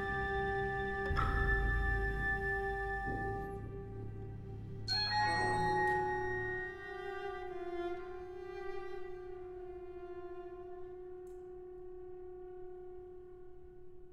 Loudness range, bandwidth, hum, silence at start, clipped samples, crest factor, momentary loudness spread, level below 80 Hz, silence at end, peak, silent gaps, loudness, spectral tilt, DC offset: 14 LU; 12 kHz; none; 0 s; under 0.1%; 18 dB; 17 LU; -46 dBFS; 0 s; -20 dBFS; none; -38 LUFS; -5.5 dB/octave; under 0.1%